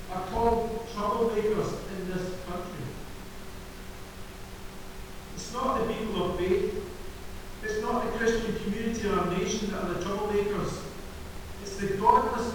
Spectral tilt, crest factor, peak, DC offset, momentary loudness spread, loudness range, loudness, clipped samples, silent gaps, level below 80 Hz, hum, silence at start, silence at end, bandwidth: -5 dB/octave; 24 dB; -6 dBFS; 0.1%; 17 LU; 9 LU; -29 LUFS; under 0.1%; none; -44 dBFS; none; 0 s; 0 s; over 20 kHz